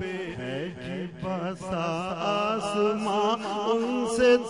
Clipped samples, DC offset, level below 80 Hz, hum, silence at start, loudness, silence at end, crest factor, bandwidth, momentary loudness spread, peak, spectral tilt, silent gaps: under 0.1%; under 0.1%; -58 dBFS; none; 0 s; -28 LUFS; 0 s; 18 dB; 11 kHz; 8 LU; -10 dBFS; -5 dB/octave; none